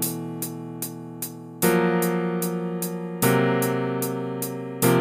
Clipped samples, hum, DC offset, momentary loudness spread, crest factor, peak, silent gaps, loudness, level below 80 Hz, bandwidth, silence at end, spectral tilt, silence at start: under 0.1%; none; under 0.1%; 12 LU; 18 dB; -6 dBFS; none; -25 LUFS; -62 dBFS; 16 kHz; 0 s; -5 dB/octave; 0 s